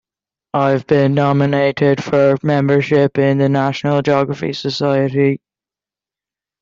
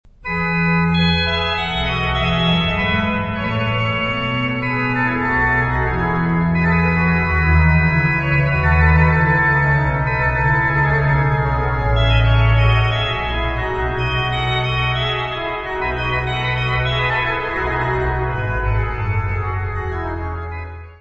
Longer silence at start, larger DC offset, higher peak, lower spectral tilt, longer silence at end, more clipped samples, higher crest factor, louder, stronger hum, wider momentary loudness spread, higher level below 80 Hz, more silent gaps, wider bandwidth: first, 0.55 s vs 0.2 s; neither; about the same, 0 dBFS vs -2 dBFS; about the same, -7.5 dB/octave vs -7.5 dB/octave; first, 1.25 s vs 0.05 s; neither; about the same, 14 dB vs 16 dB; about the same, -15 LUFS vs -17 LUFS; neither; about the same, 5 LU vs 7 LU; second, -54 dBFS vs -26 dBFS; neither; about the same, 7.4 kHz vs 7.8 kHz